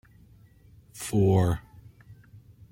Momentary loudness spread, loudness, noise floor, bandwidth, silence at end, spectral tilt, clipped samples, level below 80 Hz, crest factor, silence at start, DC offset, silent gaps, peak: 17 LU; -26 LUFS; -55 dBFS; 16.5 kHz; 0.35 s; -7 dB/octave; under 0.1%; -50 dBFS; 20 dB; 0.95 s; under 0.1%; none; -10 dBFS